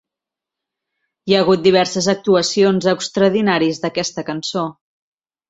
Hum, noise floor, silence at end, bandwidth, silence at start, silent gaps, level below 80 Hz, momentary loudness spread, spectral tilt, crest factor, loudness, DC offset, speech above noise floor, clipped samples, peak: none; -86 dBFS; 0.8 s; 8 kHz; 1.25 s; none; -58 dBFS; 10 LU; -4.5 dB/octave; 16 dB; -16 LUFS; under 0.1%; 70 dB; under 0.1%; -2 dBFS